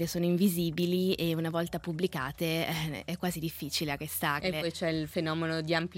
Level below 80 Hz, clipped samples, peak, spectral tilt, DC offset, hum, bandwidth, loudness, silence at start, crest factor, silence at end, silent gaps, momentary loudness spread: -58 dBFS; under 0.1%; -12 dBFS; -5 dB/octave; under 0.1%; none; 17 kHz; -31 LUFS; 0 s; 18 dB; 0 s; none; 6 LU